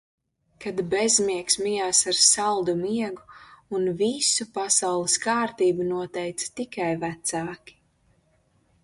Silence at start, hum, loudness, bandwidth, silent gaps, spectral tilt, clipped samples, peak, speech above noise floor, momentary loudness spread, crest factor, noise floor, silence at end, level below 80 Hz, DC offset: 0.6 s; none; -23 LUFS; 11.5 kHz; none; -2 dB/octave; under 0.1%; -2 dBFS; 41 dB; 13 LU; 24 dB; -65 dBFS; 1.3 s; -64 dBFS; under 0.1%